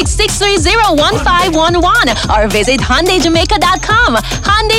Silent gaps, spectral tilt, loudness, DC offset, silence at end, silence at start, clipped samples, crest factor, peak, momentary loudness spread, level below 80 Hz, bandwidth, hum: none; -3.5 dB/octave; -10 LUFS; under 0.1%; 0 s; 0 s; under 0.1%; 10 dB; 0 dBFS; 2 LU; -20 dBFS; 16.5 kHz; none